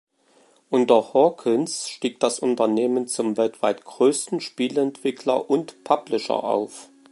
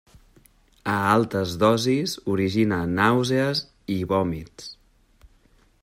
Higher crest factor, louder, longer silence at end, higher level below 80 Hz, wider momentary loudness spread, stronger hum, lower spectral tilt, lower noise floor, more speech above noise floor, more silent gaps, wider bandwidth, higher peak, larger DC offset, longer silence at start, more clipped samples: about the same, 20 dB vs 18 dB; about the same, -22 LUFS vs -23 LUFS; second, 0.3 s vs 1.1 s; second, -76 dBFS vs -54 dBFS; second, 8 LU vs 13 LU; neither; second, -4 dB/octave vs -5.5 dB/octave; about the same, -59 dBFS vs -59 dBFS; about the same, 37 dB vs 36 dB; neither; second, 11.5 kHz vs 16 kHz; first, -2 dBFS vs -6 dBFS; neither; second, 0.7 s vs 0.85 s; neither